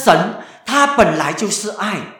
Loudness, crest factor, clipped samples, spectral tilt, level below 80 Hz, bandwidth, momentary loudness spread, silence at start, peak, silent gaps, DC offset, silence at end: -16 LUFS; 16 dB; under 0.1%; -3.5 dB/octave; -46 dBFS; 19 kHz; 10 LU; 0 s; 0 dBFS; none; under 0.1%; 0 s